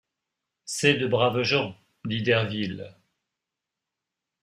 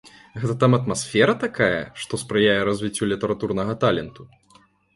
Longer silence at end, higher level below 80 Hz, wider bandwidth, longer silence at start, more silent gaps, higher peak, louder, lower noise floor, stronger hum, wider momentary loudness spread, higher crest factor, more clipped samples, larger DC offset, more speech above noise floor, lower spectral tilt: first, 1.5 s vs 0.7 s; second, -64 dBFS vs -52 dBFS; first, 15.5 kHz vs 11.5 kHz; first, 0.65 s vs 0.05 s; neither; second, -6 dBFS vs -2 dBFS; second, -25 LUFS vs -22 LUFS; first, -86 dBFS vs -56 dBFS; neither; first, 17 LU vs 11 LU; about the same, 22 dB vs 20 dB; neither; neither; first, 62 dB vs 35 dB; about the same, -4.5 dB/octave vs -5 dB/octave